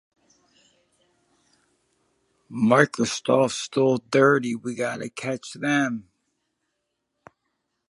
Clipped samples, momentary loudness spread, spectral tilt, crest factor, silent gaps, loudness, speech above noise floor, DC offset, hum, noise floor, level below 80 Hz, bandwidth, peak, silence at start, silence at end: under 0.1%; 12 LU; -5 dB/octave; 24 dB; none; -23 LUFS; 56 dB; under 0.1%; none; -78 dBFS; -70 dBFS; 11.5 kHz; -2 dBFS; 2.5 s; 1.9 s